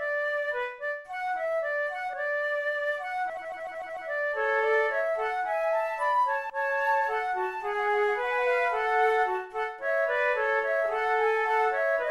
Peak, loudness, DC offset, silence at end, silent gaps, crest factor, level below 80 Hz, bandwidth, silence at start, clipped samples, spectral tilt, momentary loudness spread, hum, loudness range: -14 dBFS; -28 LUFS; under 0.1%; 0 s; none; 14 dB; -66 dBFS; 13 kHz; 0 s; under 0.1%; -2.5 dB/octave; 8 LU; none; 4 LU